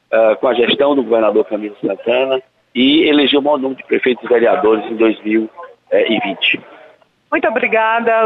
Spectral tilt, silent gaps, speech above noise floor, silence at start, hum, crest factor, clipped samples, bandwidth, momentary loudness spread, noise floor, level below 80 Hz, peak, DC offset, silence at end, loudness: -7 dB/octave; none; 33 dB; 0.1 s; none; 12 dB; under 0.1%; 4.3 kHz; 9 LU; -47 dBFS; -60 dBFS; -4 dBFS; under 0.1%; 0 s; -14 LUFS